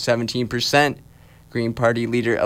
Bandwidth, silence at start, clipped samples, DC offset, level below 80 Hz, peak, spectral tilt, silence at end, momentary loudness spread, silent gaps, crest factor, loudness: 16.5 kHz; 0 s; under 0.1%; under 0.1%; -52 dBFS; -4 dBFS; -4.5 dB/octave; 0 s; 9 LU; none; 16 dB; -21 LUFS